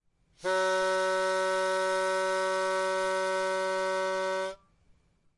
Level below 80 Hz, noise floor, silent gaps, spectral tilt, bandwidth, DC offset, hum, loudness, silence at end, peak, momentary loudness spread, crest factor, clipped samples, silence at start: -68 dBFS; -65 dBFS; none; -2.5 dB/octave; 11.5 kHz; under 0.1%; none; -29 LUFS; 0.85 s; -18 dBFS; 4 LU; 12 dB; under 0.1%; 0.4 s